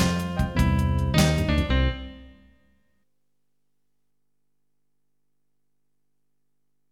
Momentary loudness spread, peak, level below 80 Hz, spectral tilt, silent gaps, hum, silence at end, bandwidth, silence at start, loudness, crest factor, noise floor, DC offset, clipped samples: 7 LU; -6 dBFS; -32 dBFS; -5.5 dB/octave; none; none; 4.65 s; 17 kHz; 0 s; -23 LUFS; 20 dB; -81 dBFS; under 0.1%; under 0.1%